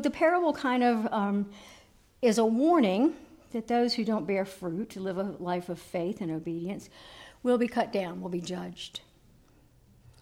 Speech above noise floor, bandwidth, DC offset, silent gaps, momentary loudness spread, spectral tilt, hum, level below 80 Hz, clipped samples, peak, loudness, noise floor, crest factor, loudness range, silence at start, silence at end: 32 dB; 16 kHz; under 0.1%; none; 15 LU; -5.5 dB/octave; none; -64 dBFS; under 0.1%; -14 dBFS; -29 LUFS; -60 dBFS; 16 dB; 6 LU; 0 s; 1.25 s